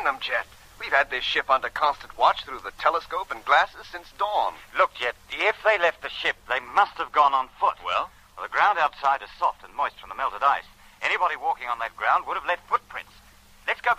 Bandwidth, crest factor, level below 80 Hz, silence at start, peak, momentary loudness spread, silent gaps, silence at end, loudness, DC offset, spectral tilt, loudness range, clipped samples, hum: 15.5 kHz; 20 dB; -56 dBFS; 0 s; -6 dBFS; 9 LU; none; 0 s; -24 LUFS; under 0.1%; -2 dB/octave; 2 LU; under 0.1%; none